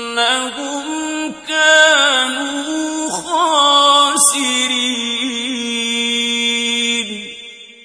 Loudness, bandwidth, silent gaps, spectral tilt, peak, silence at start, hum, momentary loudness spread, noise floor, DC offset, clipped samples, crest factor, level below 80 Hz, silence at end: -14 LUFS; 11 kHz; none; 0 dB/octave; 0 dBFS; 0 s; none; 13 LU; -36 dBFS; under 0.1%; under 0.1%; 16 dB; -58 dBFS; 0.15 s